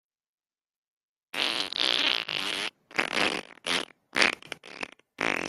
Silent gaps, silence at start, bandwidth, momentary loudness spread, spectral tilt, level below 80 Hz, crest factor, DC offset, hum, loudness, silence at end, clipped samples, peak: none; 1.35 s; 15 kHz; 15 LU; -1 dB/octave; -70 dBFS; 28 dB; under 0.1%; none; -27 LUFS; 0 s; under 0.1%; -4 dBFS